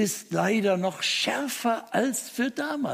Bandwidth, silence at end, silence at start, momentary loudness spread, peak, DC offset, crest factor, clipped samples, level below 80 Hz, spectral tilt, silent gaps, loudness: 15.5 kHz; 0 s; 0 s; 4 LU; -12 dBFS; under 0.1%; 16 dB; under 0.1%; -74 dBFS; -3.5 dB/octave; none; -26 LUFS